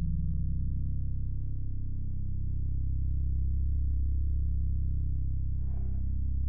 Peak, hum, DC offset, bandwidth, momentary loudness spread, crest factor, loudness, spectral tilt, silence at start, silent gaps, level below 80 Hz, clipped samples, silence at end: -20 dBFS; none; 2%; 0.8 kHz; 5 LU; 8 dB; -34 LUFS; -16.5 dB/octave; 0 s; none; -32 dBFS; under 0.1%; 0 s